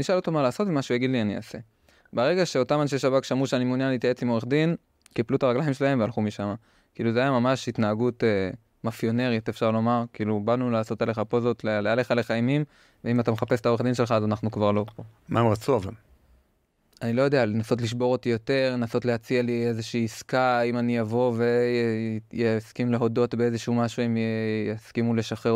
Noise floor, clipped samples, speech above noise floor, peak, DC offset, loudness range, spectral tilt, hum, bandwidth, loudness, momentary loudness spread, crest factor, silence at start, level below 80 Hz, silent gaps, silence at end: -69 dBFS; under 0.1%; 44 dB; -8 dBFS; under 0.1%; 2 LU; -6.5 dB/octave; none; 15 kHz; -25 LUFS; 6 LU; 16 dB; 0 s; -62 dBFS; none; 0 s